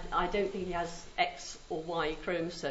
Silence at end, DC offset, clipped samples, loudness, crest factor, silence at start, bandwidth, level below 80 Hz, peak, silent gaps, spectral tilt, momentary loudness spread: 0 s; under 0.1%; under 0.1%; -35 LUFS; 18 dB; 0 s; 7.6 kHz; -48 dBFS; -16 dBFS; none; -3 dB/octave; 7 LU